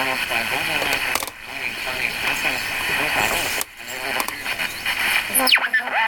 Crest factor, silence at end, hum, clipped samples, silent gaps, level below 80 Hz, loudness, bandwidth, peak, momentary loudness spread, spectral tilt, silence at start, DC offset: 22 dB; 0 s; none; under 0.1%; none; -48 dBFS; -20 LUFS; 17.5 kHz; -2 dBFS; 9 LU; -0.5 dB/octave; 0 s; under 0.1%